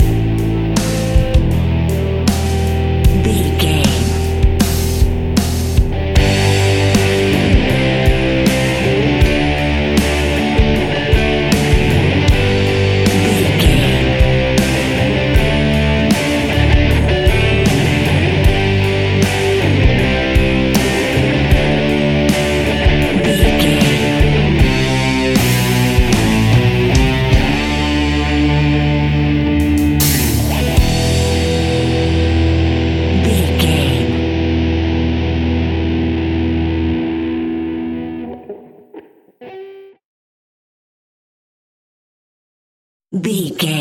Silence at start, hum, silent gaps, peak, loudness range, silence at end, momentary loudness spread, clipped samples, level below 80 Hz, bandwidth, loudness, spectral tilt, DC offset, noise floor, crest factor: 0 s; none; 40.05-43.00 s; 0 dBFS; 4 LU; 0 s; 4 LU; under 0.1%; -20 dBFS; 17 kHz; -14 LUFS; -5.5 dB/octave; under 0.1%; -39 dBFS; 14 dB